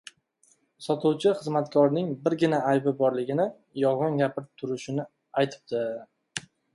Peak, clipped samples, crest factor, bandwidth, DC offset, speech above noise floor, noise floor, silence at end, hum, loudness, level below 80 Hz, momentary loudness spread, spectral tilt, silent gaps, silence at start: -10 dBFS; under 0.1%; 18 dB; 11.5 kHz; under 0.1%; 40 dB; -66 dBFS; 0.35 s; none; -27 LUFS; -72 dBFS; 13 LU; -6.5 dB/octave; none; 0.8 s